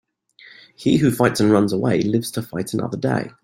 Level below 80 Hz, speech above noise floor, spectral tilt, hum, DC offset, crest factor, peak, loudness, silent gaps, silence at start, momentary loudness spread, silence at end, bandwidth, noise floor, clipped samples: -54 dBFS; 30 dB; -6 dB/octave; none; under 0.1%; 18 dB; -2 dBFS; -20 LUFS; none; 0.45 s; 9 LU; 0.15 s; 16.5 kHz; -49 dBFS; under 0.1%